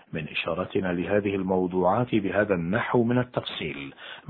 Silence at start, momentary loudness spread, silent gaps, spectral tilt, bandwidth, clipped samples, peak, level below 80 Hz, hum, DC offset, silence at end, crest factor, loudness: 0.1 s; 8 LU; none; -10.5 dB/octave; 4.6 kHz; under 0.1%; -8 dBFS; -56 dBFS; none; under 0.1%; 0.1 s; 18 dB; -26 LUFS